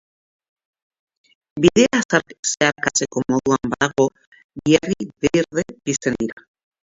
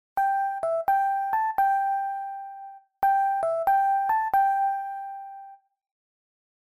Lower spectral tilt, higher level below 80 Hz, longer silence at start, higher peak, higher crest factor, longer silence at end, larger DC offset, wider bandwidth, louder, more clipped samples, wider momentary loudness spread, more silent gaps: about the same, -4 dB/octave vs -4 dB/octave; first, -52 dBFS vs -64 dBFS; first, 1.55 s vs 0.15 s; first, 0 dBFS vs -14 dBFS; first, 20 dB vs 12 dB; second, 0.55 s vs 1.25 s; neither; second, 8 kHz vs 14.5 kHz; first, -19 LUFS vs -25 LUFS; neither; second, 9 LU vs 17 LU; first, 2.05-2.09 s, 2.39-2.43 s, 4.27-4.32 s, 4.44-4.49 s vs none